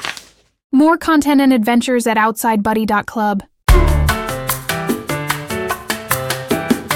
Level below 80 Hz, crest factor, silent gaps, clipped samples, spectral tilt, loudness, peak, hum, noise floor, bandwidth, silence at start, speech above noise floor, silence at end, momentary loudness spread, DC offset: -24 dBFS; 16 dB; 0.64-0.70 s; under 0.1%; -5 dB/octave; -16 LUFS; 0 dBFS; none; -40 dBFS; 18 kHz; 0 s; 26 dB; 0 s; 8 LU; under 0.1%